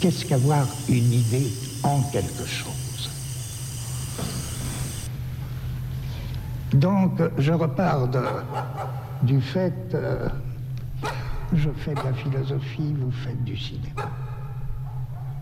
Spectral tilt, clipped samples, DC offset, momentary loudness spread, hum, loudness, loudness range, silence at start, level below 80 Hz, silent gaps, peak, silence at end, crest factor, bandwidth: -6 dB/octave; under 0.1%; under 0.1%; 11 LU; none; -26 LUFS; 7 LU; 0 s; -40 dBFS; none; -8 dBFS; 0 s; 18 dB; 16.5 kHz